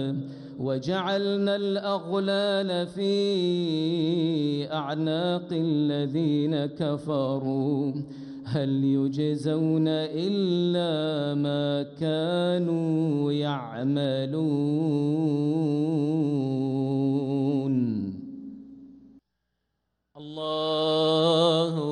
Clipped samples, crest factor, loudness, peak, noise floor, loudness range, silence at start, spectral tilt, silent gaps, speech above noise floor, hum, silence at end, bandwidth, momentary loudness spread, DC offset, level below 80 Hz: under 0.1%; 16 dB; -26 LUFS; -10 dBFS; -79 dBFS; 3 LU; 0 s; -7.5 dB/octave; none; 54 dB; none; 0 s; 10 kHz; 6 LU; under 0.1%; -68 dBFS